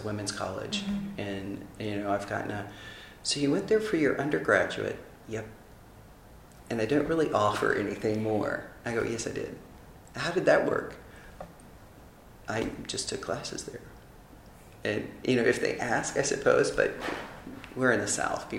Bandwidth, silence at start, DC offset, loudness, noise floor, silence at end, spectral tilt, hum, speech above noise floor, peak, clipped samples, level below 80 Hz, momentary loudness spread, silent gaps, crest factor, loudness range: 16 kHz; 0 s; under 0.1%; -29 LUFS; -52 dBFS; 0 s; -4 dB/octave; none; 22 dB; -8 dBFS; under 0.1%; -56 dBFS; 17 LU; none; 22 dB; 7 LU